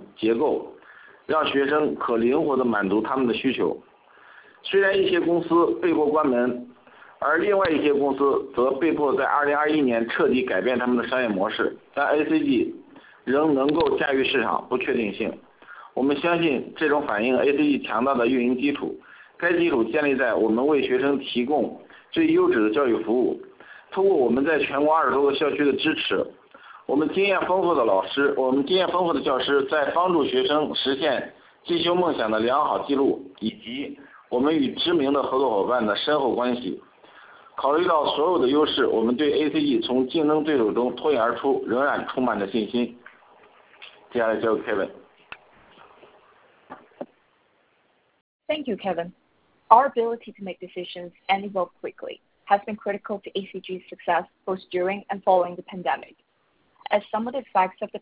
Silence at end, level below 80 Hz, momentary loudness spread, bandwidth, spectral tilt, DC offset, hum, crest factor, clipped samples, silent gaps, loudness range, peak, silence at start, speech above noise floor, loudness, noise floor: 0.05 s; -60 dBFS; 12 LU; 4 kHz; -9 dB/octave; under 0.1%; none; 22 dB; under 0.1%; 48.21-48.40 s; 6 LU; -2 dBFS; 0 s; 44 dB; -23 LUFS; -67 dBFS